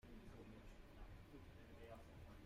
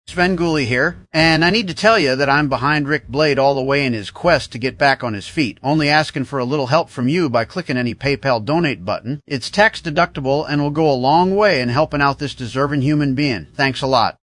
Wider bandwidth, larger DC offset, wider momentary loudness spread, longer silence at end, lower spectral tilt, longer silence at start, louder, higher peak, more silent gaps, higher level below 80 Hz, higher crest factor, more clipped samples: first, 15.5 kHz vs 11 kHz; neither; second, 2 LU vs 7 LU; second, 0 s vs 0.15 s; about the same, -6.5 dB/octave vs -5.5 dB/octave; about the same, 0.05 s vs 0.1 s; second, -62 LUFS vs -17 LUFS; second, -46 dBFS vs 0 dBFS; neither; second, -64 dBFS vs -44 dBFS; about the same, 12 dB vs 16 dB; neither